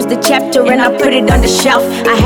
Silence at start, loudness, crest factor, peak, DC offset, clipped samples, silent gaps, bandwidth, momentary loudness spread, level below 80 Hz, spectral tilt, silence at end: 0 s; -10 LUFS; 10 dB; 0 dBFS; under 0.1%; under 0.1%; none; 19.5 kHz; 2 LU; -22 dBFS; -4 dB/octave; 0 s